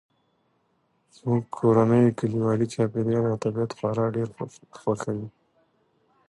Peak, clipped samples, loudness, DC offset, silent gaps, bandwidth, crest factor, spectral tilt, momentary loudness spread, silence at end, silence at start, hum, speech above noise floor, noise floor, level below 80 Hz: -8 dBFS; under 0.1%; -25 LUFS; under 0.1%; none; 11.5 kHz; 18 dB; -8.5 dB/octave; 14 LU; 1 s; 1.25 s; none; 46 dB; -70 dBFS; -62 dBFS